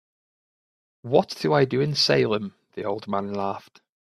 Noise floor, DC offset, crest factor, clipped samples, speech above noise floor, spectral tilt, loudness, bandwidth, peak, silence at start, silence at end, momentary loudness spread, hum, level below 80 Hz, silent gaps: under -90 dBFS; under 0.1%; 20 dB; under 0.1%; over 67 dB; -5.5 dB/octave; -24 LUFS; 13 kHz; -4 dBFS; 1.05 s; 0.5 s; 14 LU; none; -64 dBFS; none